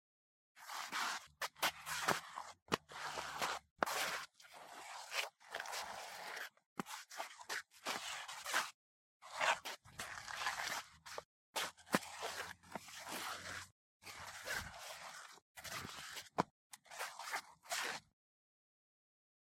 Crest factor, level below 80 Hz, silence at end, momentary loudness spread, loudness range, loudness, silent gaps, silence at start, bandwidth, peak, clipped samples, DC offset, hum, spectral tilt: 32 dB; -78 dBFS; 1.45 s; 13 LU; 5 LU; -44 LUFS; 2.62-2.66 s, 3.71-3.76 s, 6.66-6.76 s, 8.74-9.20 s, 11.25-11.53 s, 13.72-14.00 s, 15.42-15.55 s, 16.51-16.70 s; 0.55 s; 16 kHz; -14 dBFS; under 0.1%; under 0.1%; none; -1.5 dB/octave